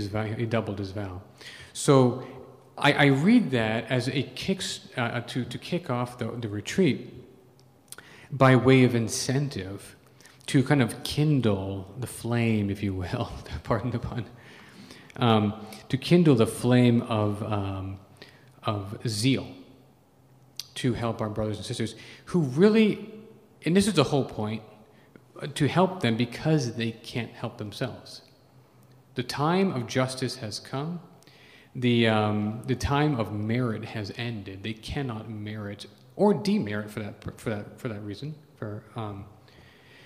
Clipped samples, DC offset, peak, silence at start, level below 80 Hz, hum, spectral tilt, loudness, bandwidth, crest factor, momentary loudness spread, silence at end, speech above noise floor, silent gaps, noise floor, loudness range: under 0.1%; under 0.1%; -6 dBFS; 0 s; -56 dBFS; none; -6 dB/octave; -26 LUFS; 15.5 kHz; 22 dB; 19 LU; 0.75 s; 32 dB; none; -58 dBFS; 7 LU